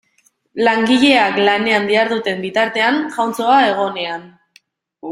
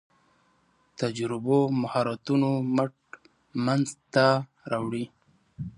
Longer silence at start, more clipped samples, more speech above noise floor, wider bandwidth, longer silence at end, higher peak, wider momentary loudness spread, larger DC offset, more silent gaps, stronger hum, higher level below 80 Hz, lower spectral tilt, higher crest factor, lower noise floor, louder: second, 0.55 s vs 1 s; neither; about the same, 44 dB vs 41 dB; first, 15 kHz vs 11 kHz; about the same, 0 s vs 0.05 s; first, 0 dBFS vs -6 dBFS; first, 12 LU vs 9 LU; neither; neither; neither; about the same, -60 dBFS vs -64 dBFS; second, -4 dB/octave vs -6.5 dB/octave; second, 16 dB vs 22 dB; second, -60 dBFS vs -66 dBFS; first, -15 LUFS vs -27 LUFS